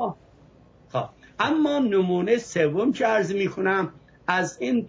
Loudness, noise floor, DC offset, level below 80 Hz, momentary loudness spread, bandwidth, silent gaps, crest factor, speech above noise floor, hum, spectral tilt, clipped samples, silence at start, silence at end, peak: -24 LUFS; -53 dBFS; under 0.1%; -62 dBFS; 10 LU; 7.8 kHz; none; 16 dB; 30 dB; none; -5.5 dB/octave; under 0.1%; 0 s; 0 s; -8 dBFS